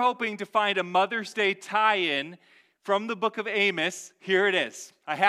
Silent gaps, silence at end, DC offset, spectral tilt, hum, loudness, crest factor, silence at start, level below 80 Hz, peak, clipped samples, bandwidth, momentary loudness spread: none; 0 s; under 0.1%; -3 dB/octave; none; -26 LUFS; 20 dB; 0 s; -82 dBFS; -6 dBFS; under 0.1%; 13.5 kHz; 11 LU